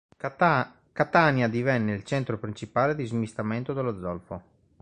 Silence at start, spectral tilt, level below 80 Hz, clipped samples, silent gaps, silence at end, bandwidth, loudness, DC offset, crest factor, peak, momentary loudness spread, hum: 0.25 s; -7 dB/octave; -56 dBFS; under 0.1%; none; 0.4 s; 9.8 kHz; -26 LUFS; under 0.1%; 22 dB; -6 dBFS; 13 LU; none